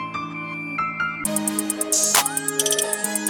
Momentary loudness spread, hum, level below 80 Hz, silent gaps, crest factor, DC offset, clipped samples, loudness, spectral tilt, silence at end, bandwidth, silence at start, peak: 12 LU; none; -60 dBFS; none; 20 dB; under 0.1%; under 0.1%; -21 LUFS; -1.5 dB/octave; 0 s; 19.5 kHz; 0 s; -2 dBFS